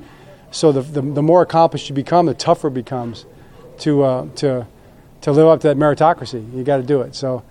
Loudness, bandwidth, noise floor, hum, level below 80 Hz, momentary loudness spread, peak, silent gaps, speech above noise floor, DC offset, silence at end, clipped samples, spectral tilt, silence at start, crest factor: -17 LUFS; 11.5 kHz; -43 dBFS; none; -50 dBFS; 13 LU; 0 dBFS; none; 27 dB; under 0.1%; 0.1 s; under 0.1%; -6.5 dB/octave; 0 s; 16 dB